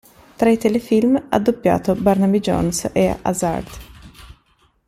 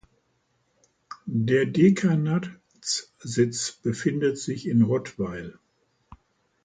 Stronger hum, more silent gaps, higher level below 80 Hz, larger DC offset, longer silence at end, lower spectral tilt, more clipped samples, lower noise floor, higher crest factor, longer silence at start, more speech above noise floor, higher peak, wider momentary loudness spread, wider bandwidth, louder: neither; neither; first, -42 dBFS vs -60 dBFS; neither; second, 0.6 s vs 1.15 s; about the same, -6 dB/octave vs -5.5 dB/octave; neither; second, -59 dBFS vs -71 dBFS; about the same, 18 dB vs 18 dB; second, 0.4 s vs 1.1 s; second, 42 dB vs 47 dB; first, -2 dBFS vs -8 dBFS; second, 6 LU vs 17 LU; first, 15.5 kHz vs 9.6 kHz; first, -18 LUFS vs -25 LUFS